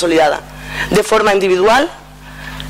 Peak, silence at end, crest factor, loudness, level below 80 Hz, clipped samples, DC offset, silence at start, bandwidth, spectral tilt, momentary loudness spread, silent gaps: -4 dBFS; 0 s; 10 dB; -13 LUFS; -36 dBFS; under 0.1%; under 0.1%; 0 s; 16 kHz; -4 dB/octave; 15 LU; none